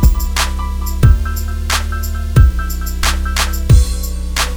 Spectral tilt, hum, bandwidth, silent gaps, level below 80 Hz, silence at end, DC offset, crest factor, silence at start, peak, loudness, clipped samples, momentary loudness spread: -4.5 dB/octave; none; over 20 kHz; none; -14 dBFS; 0 s; under 0.1%; 14 dB; 0 s; 0 dBFS; -16 LUFS; 0.3%; 9 LU